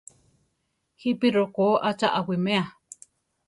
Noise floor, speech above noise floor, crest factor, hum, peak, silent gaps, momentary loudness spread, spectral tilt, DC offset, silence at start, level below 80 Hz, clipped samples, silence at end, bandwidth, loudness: -76 dBFS; 52 dB; 18 dB; none; -8 dBFS; none; 21 LU; -6 dB/octave; under 0.1%; 1.05 s; -68 dBFS; under 0.1%; 0.75 s; 11.5 kHz; -24 LUFS